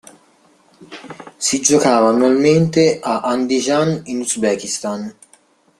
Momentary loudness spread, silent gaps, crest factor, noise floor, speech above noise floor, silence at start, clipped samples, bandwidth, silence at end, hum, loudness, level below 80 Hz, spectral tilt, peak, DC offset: 18 LU; none; 18 dB; -54 dBFS; 38 dB; 0.8 s; under 0.1%; 13.5 kHz; 0.7 s; none; -16 LUFS; -58 dBFS; -4.5 dB/octave; 0 dBFS; under 0.1%